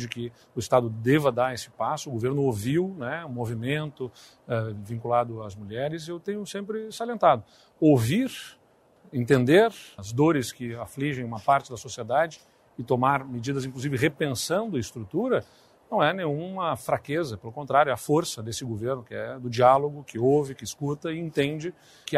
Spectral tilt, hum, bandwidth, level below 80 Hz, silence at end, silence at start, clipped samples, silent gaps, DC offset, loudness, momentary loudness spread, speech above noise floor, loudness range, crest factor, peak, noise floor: -6 dB/octave; none; 15.5 kHz; -62 dBFS; 0 s; 0 s; under 0.1%; none; under 0.1%; -26 LUFS; 13 LU; 32 dB; 5 LU; 20 dB; -6 dBFS; -58 dBFS